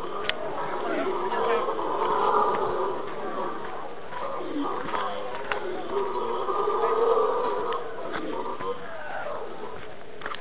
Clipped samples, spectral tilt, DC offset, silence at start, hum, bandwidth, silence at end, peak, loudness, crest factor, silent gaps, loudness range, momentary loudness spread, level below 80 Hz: under 0.1%; -2.5 dB/octave; 2%; 0 s; none; 4 kHz; 0 s; -8 dBFS; -29 LUFS; 20 dB; none; 5 LU; 13 LU; -62 dBFS